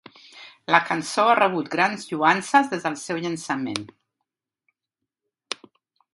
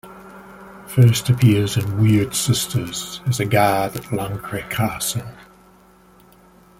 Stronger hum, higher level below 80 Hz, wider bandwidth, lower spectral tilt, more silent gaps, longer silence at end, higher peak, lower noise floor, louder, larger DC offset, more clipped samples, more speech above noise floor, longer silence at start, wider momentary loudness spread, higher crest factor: neither; second, -72 dBFS vs -48 dBFS; second, 11.5 kHz vs 16.5 kHz; about the same, -4 dB/octave vs -5 dB/octave; neither; second, 0.6 s vs 1.35 s; about the same, 0 dBFS vs -2 dBFS; first, -85 dBFS vs -50 dBFS; second, -22 LUFS vs -19 LUFS; neither; neither; first, 63 dB vs 32 dB; first, 0.35 s vs 0.05 s; second, 16 LU vs 24 LU; first, 24 dB vs 18 dB